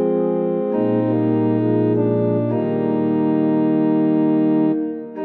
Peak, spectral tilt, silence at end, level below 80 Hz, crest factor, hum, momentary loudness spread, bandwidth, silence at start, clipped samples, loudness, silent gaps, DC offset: -6 dBFS; -12.5 dB/octave; 0 s; -78 dBFS; 10 dB; none; 3 LU; 4.3 kHz; 0 s; under 0.1%; -18 LUFS; none; under 0.1%